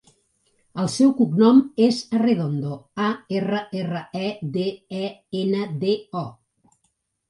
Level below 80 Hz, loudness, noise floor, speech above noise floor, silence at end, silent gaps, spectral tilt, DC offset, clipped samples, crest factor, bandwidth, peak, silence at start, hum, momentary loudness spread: -66 dBFS; -22 LUFS; -72 dBFS; 50 dB; 0.95 s; none; -6.5 dB/octave; under 0.1%; under 0.1%; 18 dB; 11.5 kHz; -4 dBFS; 0.75 s; none; 14 LU